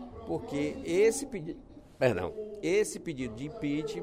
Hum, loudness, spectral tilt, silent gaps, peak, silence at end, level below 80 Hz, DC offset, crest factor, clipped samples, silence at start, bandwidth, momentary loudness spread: none; -32 LUFS; -5 dB/octave; none; -12 dBFS; 0 s; -56 dBFS; under 0.1%; 20 dB; under 0.1%; 0 s; 15.5 kHz; 12 LU